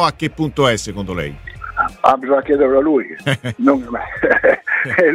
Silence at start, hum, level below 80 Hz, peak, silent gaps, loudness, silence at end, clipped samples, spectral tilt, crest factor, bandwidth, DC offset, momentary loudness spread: 0 s; none; -42 dBFS; 0 dBFS; none; -16 LUFS; 0 s; under 0.1%; -5.5 dB/octave; 16 dB; 13.5 kHz; under 0.1%; 11 LU